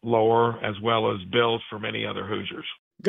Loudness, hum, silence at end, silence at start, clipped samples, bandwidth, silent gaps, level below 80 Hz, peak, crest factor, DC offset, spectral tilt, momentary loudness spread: -25 LUFS; none; 0 s; 0.05 s; under 0.1%; 3.9 kHz; 2.79-2.91 s; -64 dBFS; -8 dBFS; 18 dB; under 0.1%; -7 dB/octave; 11 LU